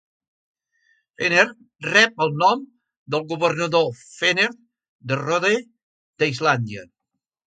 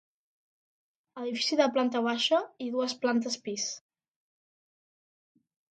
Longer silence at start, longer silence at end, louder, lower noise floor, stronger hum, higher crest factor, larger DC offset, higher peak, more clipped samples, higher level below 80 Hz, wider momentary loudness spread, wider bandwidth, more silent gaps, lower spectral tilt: about the same, 1.2 s vs 1.15 s; second, 0.65 s vs 1.95 s; first, -20 LUFS vs -29 LUFS; second, -82 dBFS vs under -90 dBFS; neither; about the same, 22 dB vs 22 dB; neither; first, 0 dBFS vs -10 dBFS; neither; first, -68 dBFS vs -84 dBFS; about the same, 11 LU vs 9 LU; about the same, 9.2 kHz vs 9.2 kHz; first, 2.97-3.06 s, 4.88-4.99 s, 5.83-6.13 s vs none; first, -4 dB/octave vs -2.5 dB/octave